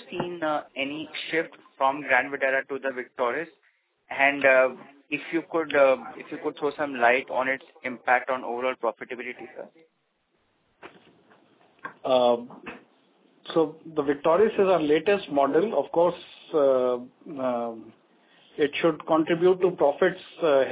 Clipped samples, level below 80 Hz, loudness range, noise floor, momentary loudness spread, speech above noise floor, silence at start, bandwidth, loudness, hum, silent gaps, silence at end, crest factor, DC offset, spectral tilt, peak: under 0.1%; -70 dBFS; 7 LU; -72 dBFS; 15 LU; 47 dB; 0 s; 4 kHz; -25 LUFS; none; none; 0 s; 20 dB; under 0.1%; -8.5 dB/octave; -6 dBFS